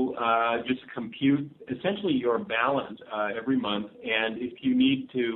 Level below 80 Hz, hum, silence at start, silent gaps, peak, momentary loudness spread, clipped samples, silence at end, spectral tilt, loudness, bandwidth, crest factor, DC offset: -66 dBFS; none; 0 s; none; -10 dBFS; 8 LU; under 0.1%; 0 s; -9 dB/octave; -27 LUFS; 4.1 kHz; 16 dB; under 0.1%